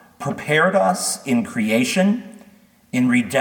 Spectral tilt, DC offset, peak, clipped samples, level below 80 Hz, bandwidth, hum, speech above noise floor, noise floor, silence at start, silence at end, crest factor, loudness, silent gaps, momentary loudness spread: -4.5 dB/octave; under 0.1%; -4 dBFS; under 0.1%; -64 dBFS; 19 kHz; none; 33 dB; -51 dBFS; 0.2 s; 0 s; 16 dB; -19 LUFS; none; 10 LU